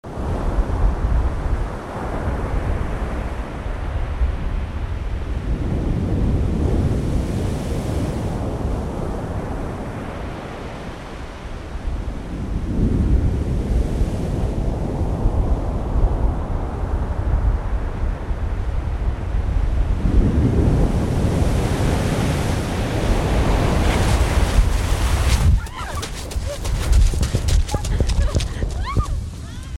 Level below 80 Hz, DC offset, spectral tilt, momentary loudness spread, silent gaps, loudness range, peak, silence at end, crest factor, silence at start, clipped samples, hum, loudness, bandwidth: -22 dBFS; under 0.1%; -6.5 dB/octave; 10 LU; none; 6 LU; -4 dBFS; 0.05 s; 14 dB; 0.05 s; under 0.1%; none; -23 LUFS; 13.5 kHz